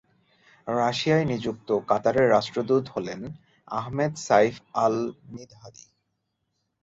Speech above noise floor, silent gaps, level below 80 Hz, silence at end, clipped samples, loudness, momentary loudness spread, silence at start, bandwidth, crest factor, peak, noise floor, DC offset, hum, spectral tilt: 53 dB; none; -60 dBFS; 1.1 s; under 0.1%; -25 LUFS; 17 LU; 0.65 s; 8 kHz; 20 dB; -6 dBFS; -77 dBFS; under 0.1%; none; -5.5 dB/octave